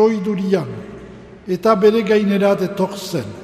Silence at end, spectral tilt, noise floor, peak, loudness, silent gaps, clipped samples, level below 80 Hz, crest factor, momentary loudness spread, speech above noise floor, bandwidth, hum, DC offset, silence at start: 0 s; -6.5 dB/octave; -37 dBFS; 0 dBFS; -17 LUFS; none; under 0.1%; -52 dBFS; 16 dB; 19 LU; 21 dB; 15 kHz; none; under 0.1%; 0 s